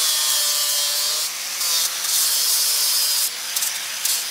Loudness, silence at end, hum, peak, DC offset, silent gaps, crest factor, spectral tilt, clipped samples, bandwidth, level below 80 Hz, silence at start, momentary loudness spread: -18 LUFS; 0 s; none; -4 dBFS; under 0.1%; none; 16 dB; 4 dB/octave; under 0.1%; 16 kHz; -80 dBFS; 0 s; 6 LU